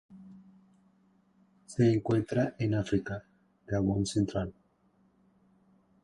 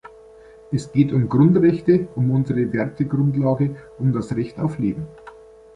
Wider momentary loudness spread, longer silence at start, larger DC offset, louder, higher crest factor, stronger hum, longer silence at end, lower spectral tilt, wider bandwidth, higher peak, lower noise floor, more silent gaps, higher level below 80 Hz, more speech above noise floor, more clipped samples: first, 14 LU vs 10 LU; second, 0.1 s vs 0.7 s; neither; second, -31 LUFS vs -20 LUFS; about the same, 18 dB vs 16 dB; neither; first, 1.5 s vs 0.45 s; second, -7 dB/octave vs -9.5 dB/octave; about the same, 11 kHz vs 10 kHz; second, -14 dBFS vs -4 dBFS; first, -68 dBFS vs -45 dBFS; neither; about the same, -54 dBFS vs -50 dBFS; first, 39 dB vs 26 dB; neither